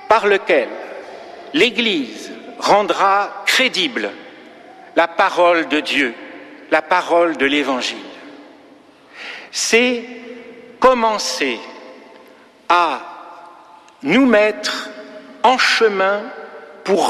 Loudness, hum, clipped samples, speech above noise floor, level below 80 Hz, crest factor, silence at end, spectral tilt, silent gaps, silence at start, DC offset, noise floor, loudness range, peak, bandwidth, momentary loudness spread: -16 LUFS; none; under 0.1%; 30 dB; -60 dBFS; 16 dB; 0 s; -2.5 dB/octave; none; 0 s; under 0.1%; -46 dBFS; 3 LU; -2 dBFS; 14.5 kHz; 21 LU